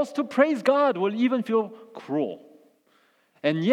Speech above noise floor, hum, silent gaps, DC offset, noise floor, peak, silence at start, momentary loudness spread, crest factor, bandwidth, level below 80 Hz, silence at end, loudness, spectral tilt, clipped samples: 40 dB; none; none; under 0.1%; -64 dBFS; -6 dBFS; 0 s; 12 LU; 20 dB; 12 kHz; -88 dBFS; 0 s; -24 LUFS; -6.5 dB/octave; under 0.1%